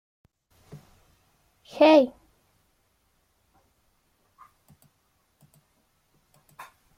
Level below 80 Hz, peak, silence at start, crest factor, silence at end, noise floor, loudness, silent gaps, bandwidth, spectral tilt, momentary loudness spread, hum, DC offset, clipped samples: -70 dBFS; -6 dBFS; 1.75 s; 24 dB; 4.9 s; -70 dBFS; -20 LUFS; none; 15 kHz; -5 dB/octave; 31 LU; none; under 0.1%; under 0.1%